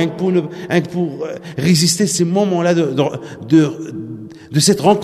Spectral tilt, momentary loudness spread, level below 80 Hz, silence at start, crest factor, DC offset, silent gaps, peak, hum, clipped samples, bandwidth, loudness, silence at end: -5 dB/octave; 15 LU; -56 dBFS; 0 s; 14 dB; under 0.1%; none; 0 dBFS; none; under 0.1%; 13.5 kHz; -16 LUFS; 0 s